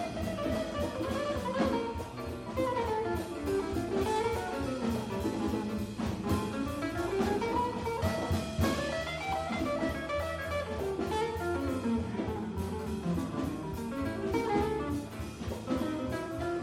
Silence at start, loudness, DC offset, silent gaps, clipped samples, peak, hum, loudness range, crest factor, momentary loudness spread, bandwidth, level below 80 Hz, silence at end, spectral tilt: 0 s; -33 LUFS; under 0.1%; none; under 0.1%; -16 dBFS; none; 2 LU; 18 dB; 5 LU; 16 kHz; -48 dBFS; 0 s; -6 dB/octave